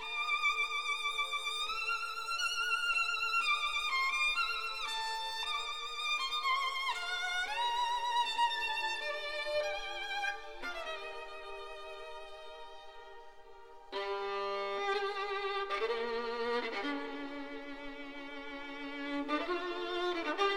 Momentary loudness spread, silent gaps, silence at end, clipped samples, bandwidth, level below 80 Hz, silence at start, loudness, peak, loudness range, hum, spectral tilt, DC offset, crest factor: 15 LU; none; 0 s; under 0.1%; 18 kHz; -62 dBFS; 0 s; -34 LUFS; -20 dBFS; 10 LU; none; -0.5 dB/octave; 0.3%; 16 dB